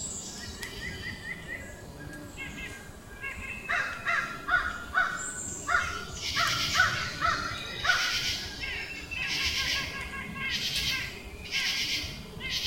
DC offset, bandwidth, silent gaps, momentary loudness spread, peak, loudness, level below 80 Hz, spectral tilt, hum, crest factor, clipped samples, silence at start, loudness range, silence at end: under 0.1%; 16.5 kHz; none; 14 LU; -10 dBFS; -30 LUFS; -50 dBFS; -1.5 dB/octave; none; 22 dB; under 0.1%; 0 s; 8 LU; 0 s